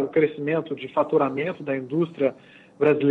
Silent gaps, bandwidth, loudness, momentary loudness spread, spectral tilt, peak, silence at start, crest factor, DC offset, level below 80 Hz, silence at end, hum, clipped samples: none; 4.5 kHz; -24 LUFS; 6 LU; -9 dB/octave; -8 dBFS; 0 s; 16 dB; under 0.1%; -68 dBFS; 0 s; none; under 0.1%